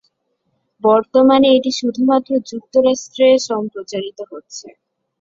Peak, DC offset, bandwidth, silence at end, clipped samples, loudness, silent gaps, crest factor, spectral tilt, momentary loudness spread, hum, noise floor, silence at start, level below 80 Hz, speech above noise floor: -2 dBFS; under 0.1%; 7.8 kHz; 0.5 s; under 0.1%; -15 LUFS; none; 16 dB; -4 dB/octave; 19 LU; none; -68 dBFS; 0.85 s; -60 dBFS; 53 dB